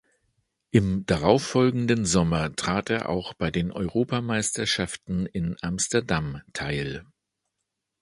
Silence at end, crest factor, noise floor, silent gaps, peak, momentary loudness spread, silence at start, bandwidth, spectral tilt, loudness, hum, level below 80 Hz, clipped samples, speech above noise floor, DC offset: 1 s; 22 dB; -82 dBFS; none; -4 dBFS; 8 LU; 0.75 s; 11.5 kHz; -5 dB/octave; -25 LUFS; none; -46 dBFS; under 0.1%; 57 dB; under 0.1%